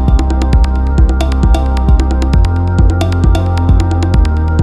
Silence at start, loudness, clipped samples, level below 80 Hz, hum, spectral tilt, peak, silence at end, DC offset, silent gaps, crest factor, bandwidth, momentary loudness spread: 0 s; -12 LUFS; under 0.1%; -12 dBFS; none; -7.5 dB/octave; 0 dBFS; 0 s; under 0.1%; none; 8 dB; 9.6 kHz; 1 LU